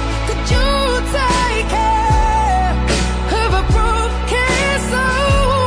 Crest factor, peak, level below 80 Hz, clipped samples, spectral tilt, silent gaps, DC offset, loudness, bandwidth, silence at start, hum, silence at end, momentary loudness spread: 12 dB; -4 dBFS; -18 dBFS; under 0.1%; -4.5 dB/octave; none; under 0.1%; -16 LUFS; 11 kHz; 0 s; none; 0 s; 3 LU